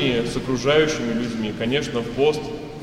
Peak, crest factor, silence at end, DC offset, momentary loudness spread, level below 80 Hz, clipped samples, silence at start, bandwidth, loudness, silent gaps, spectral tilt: -6 dBFS; 16 dB; 0 s; under 0.1%; 8 LU; -44 dBFS; under 0.1%; 0 s; 13 kHz; -22 LUFS; none; -5 dB/octave